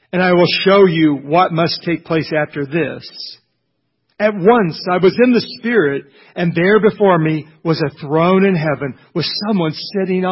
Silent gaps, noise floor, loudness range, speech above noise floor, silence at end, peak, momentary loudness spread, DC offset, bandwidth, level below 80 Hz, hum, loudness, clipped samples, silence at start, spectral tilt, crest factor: none; -69 dBFS; 4 LU; 55 dB; 0 s; 0 dBFS; 10 LU; under 0.1%; 5.8 kHz; -54 dBFS; none; -15 LUFS; under 0.1%; 0.15 s; -10 dB/octave; 14 dB